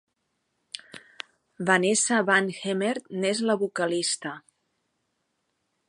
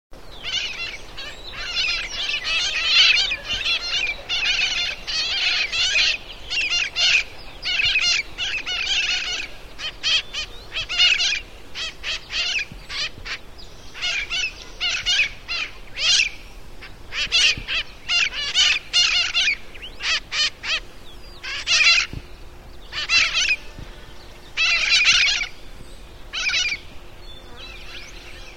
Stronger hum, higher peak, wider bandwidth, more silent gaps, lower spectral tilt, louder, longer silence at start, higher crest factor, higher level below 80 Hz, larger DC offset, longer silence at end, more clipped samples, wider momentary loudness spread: neither; second, -6 dBFS vs -2 dBFS; second, 11.5 kHz vs 16 kHz; neither; first, -3 dB/octave vs 1 dB/octave; second, -25 LUFS vs -19 LUFS; first, 0.75 s vs 0.1 s; about the same, 22 dB vs 22 dB; second, -78 dBFS vs -42 dBFS; second, under 0.1% vs 0.8%; first, 1.5 s vs 0 s; neither; first, 20 LU vs 17 LU